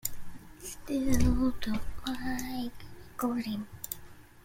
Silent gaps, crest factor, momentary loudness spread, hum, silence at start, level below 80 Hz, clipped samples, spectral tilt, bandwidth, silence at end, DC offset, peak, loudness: none; 18 dB; 17 LU; none; 0.05 s; -40 dBFS; under 0.1%; -5 dB/octave; 16.5 kHz; 0.05 s; under 0.1%; -12 dBFS; -34 LUFS